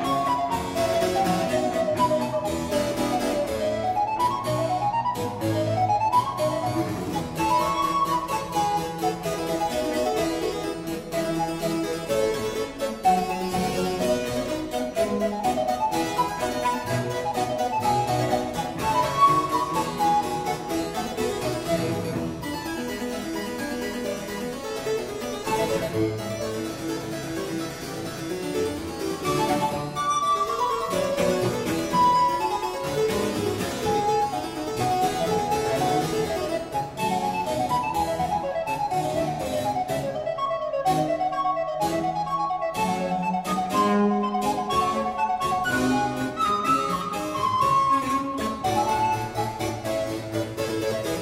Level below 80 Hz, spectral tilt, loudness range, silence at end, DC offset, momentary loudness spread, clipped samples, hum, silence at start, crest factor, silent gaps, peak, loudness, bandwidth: -48 dBFS; -5 dB/octave; 5 LU; 0 s; under 0.1%; 7 LU; under 0.1%; none; 0 s; 18 dB; none; -8 dBFS; -25 LUFS; 16 kHz